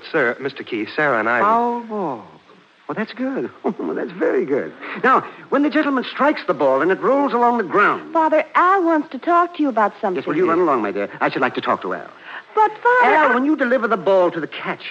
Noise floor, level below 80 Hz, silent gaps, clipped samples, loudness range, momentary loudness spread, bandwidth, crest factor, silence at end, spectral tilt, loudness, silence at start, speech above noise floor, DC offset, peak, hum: -50 dBFS; -72 dBFS; none; under 0.1%; 5 LU; 11 LU; 7.8 kHz; 14 dB; 0 s; -6.5 dB/octave; -18 LUFS; 0 s; 32 dB; under 0.1%; -4 dBFS; none